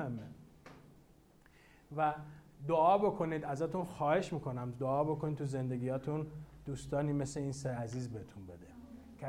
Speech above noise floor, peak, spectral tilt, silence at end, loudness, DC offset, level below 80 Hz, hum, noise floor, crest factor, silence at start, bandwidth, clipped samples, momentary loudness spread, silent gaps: 28 dB; -18 dBFS; -7 dB/octave; 0 s; -36 LUFS; under 0.1%; -62 dBFS; none; -64 dBFS; 20 dB; 0 s; 13.5 kHz; under 0.1%; 22 LU; none